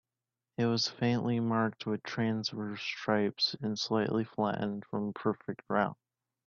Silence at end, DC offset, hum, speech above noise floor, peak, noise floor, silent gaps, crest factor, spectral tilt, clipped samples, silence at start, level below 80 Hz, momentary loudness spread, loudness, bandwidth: 0.55 s; under 0.1%; none; over 58 dB; -12 dBFS; under -90 dBFS; none; 20 dB; -5.5 dB/octave; under 0.1%; 0.6 s; -72 dBFS; 6 LU; -33 LUFS; 7.2 kHz